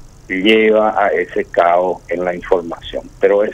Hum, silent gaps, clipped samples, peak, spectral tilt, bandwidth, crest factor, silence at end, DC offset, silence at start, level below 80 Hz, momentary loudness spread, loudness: none; none; under 0.1%; 0 dBFS; -5.5 dB/octave; 9.2 kHz; 14 dB; 0 s; under 0.1%; 0.05 s; -44 dBFS; 12 LU; -15 LUFS